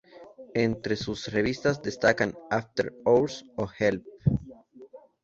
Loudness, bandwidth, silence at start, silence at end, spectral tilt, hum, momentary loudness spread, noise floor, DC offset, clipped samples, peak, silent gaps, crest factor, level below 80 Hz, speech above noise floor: -27 LUFS; 7.8 kHz; 0.15 s; 0.25 s; -6 dB/octave; none; 9 LU; -50 dBFS; under 0.1%; under 0.1%; -8 dBFS; none; 20 dB; -50 dBFS; 23 dB